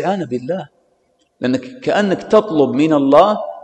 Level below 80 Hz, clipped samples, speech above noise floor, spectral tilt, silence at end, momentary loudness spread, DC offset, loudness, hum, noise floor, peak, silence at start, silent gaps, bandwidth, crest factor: -56 dBFS; under 0.1%; 46 dB; -6.5 dB/octave; 0.05 s; 12 LU; under 0.1%; -15 LUFS; none; -61 dBFS; 0 dBFS; 0 s; none; 8.8 kHz; 16 dB